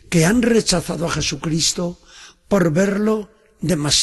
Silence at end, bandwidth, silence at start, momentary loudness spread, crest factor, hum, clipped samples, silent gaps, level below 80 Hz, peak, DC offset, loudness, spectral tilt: 0 s; 12.5 kHz; 0.1 s; 11 LU; 16 dB; none; under 0.1%; none; -42 dBFS; -2 dBFS; under 0.1%; -19 LUFS; -4 dB/octave